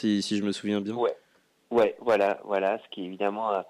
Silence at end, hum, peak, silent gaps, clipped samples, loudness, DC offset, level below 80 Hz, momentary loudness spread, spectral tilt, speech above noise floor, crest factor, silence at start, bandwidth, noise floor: 0.05 s; none; -14 dBFS; none; under 0.1%; -27 LUFS; under 0.1%; -70 dBFS; 6 LU; -5.5 dB/octave; 26 dB; 14 dB; 0 s; 12.5 kHz; -52 dBFS